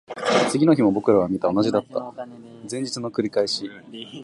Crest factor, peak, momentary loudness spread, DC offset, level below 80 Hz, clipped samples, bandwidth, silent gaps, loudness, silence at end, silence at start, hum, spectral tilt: 18 dB; -4 dBFS; 19 LU; under 0.1%; -60 dBFS; under 0.1%; 11.5 kHz; none; -21 LUFS; 0 s; 0.1 s; none; -5.5 dB/octave